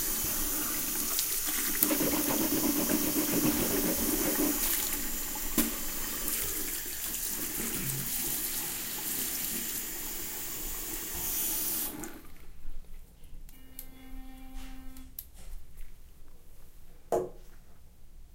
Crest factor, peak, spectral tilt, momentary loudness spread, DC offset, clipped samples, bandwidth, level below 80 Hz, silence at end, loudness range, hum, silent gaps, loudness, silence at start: 30 dB; -2 dBFS; -2.5 dB/octave; 21 LU; under 0.1%; under 0.1%; 17 kHz; -46 dBFS; 0 s; 22 LU; none; none; -30 LUFS; 0 s